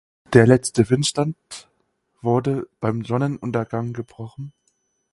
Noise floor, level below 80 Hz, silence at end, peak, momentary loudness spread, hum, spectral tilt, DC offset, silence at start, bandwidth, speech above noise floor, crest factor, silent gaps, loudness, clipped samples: -69 dBFS; -54 dBFS; 0.65 s; 0 dBFS; 20 LU; none; -6 dB/octave; under 0.1%; 0.3 s; 11.5 kHz; 49 dB; 22 dB; none; -20 LUFS; under 0.1%